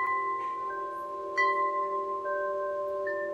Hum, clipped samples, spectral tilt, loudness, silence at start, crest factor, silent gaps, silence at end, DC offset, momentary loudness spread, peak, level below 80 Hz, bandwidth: none; under 0.1%; -4 dB/octave; -31 LUFS; 0 s; 16 dB; none; 0 s; under 0.1%; 8 LU; -16 dBFS; -74 dBFS; 9.6 kHz